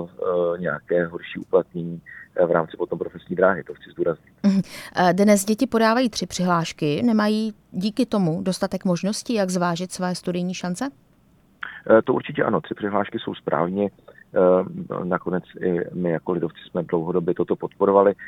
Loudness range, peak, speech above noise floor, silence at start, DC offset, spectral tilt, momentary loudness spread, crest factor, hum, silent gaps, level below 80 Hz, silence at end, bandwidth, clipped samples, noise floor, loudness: 4 LU; -2 dBFS; 35 dB; 0 s; under 0.1%; -6 dB/octave; 11 LU; 20 dB; none; none; -60 dBFS; 0 s; 15 kHz; under 0.1%; -57 dBFS; -23 LUFS